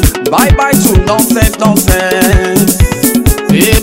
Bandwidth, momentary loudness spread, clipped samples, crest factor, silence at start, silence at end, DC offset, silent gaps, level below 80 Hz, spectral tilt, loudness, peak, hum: over 20 kHz; 2 LU; 1%; 8 dB; 0 s; 0 s; under 0.1%; none; -16 dBFS; -4.5 dB/octave; -9 LUFS; 0 dBFS; none